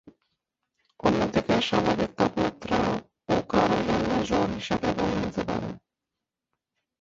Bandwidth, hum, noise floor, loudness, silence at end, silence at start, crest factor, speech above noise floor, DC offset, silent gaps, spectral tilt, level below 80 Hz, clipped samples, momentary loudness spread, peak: 7.8 kHz; none; -87 dBFS; -26 LUFS; 1.2 s; 0.05 s; 20 dB; 60 dB; under 0.1%; none; -6 dB/octave; -48 dBFS; under 0.1%; 7 LU; -8 dBFS